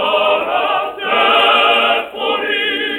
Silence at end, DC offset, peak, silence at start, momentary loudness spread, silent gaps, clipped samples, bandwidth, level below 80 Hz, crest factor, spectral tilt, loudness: 0 s; under 0.1%; -2 dBFS; 0 s; 8 LU; none; under 0.1%; 16.5 kHz; -56 dBFS; 14 dB; -2.5 dB/octave; -13 LUFS